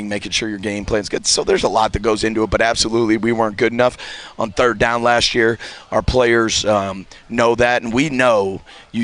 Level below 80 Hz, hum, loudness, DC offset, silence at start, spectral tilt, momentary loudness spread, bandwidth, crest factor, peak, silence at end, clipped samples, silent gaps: -36 dBFS; none; -17 LUFS; under 0.1%; 0 s; -3.5 dB/octave; 10 LU; 10.5 kHz; 14 dB; -2 dBFS; 0 s; under 0.1%; none